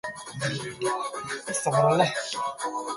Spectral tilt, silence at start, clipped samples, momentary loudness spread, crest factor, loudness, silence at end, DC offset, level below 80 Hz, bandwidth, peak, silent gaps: -4 dB/octave; 0.05 s; under 0.1%; 10 LU; 22 dB; -27 LUFS; 0 s; under 0.1%; -64 dBFS; 11.5 kHz; -6 dBFS; none